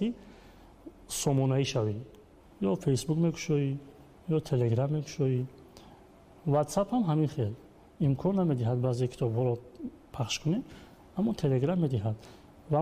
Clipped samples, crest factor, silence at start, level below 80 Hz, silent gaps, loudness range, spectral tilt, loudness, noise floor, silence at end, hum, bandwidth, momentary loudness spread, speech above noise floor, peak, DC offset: under 0.1%; 14 dB; 0 s; -58 dBFS; none; 2 LU; -6.5 dB/octave; -30 LUFS; -55 dBFS; 0 s; none; 15.5 kHz; 13 LU; 26 dB; -16 dBFS; under 0.1%